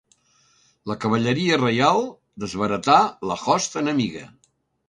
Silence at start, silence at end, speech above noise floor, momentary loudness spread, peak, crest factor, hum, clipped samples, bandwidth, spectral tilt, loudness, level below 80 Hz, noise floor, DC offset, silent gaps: 0.85 s; 0.6 s; 40 dB; 15 LU; -2 dBFS; 22 dB; none; under 0.1%; 11 kHz; -4.5 dB/octave; -21 LUFS; -58 dBFS; -61 dBFS; under 0.1%; none